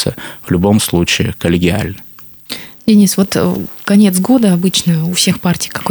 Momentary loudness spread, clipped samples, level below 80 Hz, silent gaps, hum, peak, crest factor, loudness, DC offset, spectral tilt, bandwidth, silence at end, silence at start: 15 LU; under 0.1%; -40 dBFS; none; none; 0 dBFS; 12 dB; -12 LUFS; under 0.1%; -5 dB/octave; over 20 kHz; 0 s; 0 s